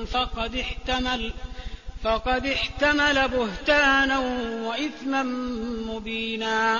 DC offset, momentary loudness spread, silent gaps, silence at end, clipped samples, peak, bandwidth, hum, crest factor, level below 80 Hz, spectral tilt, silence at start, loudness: 0.3%; 11 LU; none; 0 s; under 0.1%; -8 dBFS; 7.6 kHz; none; 18 dB; -38 dBFS; -4 dB/octave; 0 s; -24 LUFS